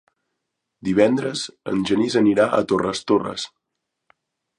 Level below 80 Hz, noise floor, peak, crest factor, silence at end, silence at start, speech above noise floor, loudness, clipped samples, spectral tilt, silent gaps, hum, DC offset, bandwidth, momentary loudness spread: -58 dBFS; -80 dBFS; -2 dBFS; 20 dB; 1.1 s; 0.85 s; 60 dB; -21 LUFS; under 0.1%; -5 dB/octave; none; none; under 0.1%; 11 kHz; 12 LU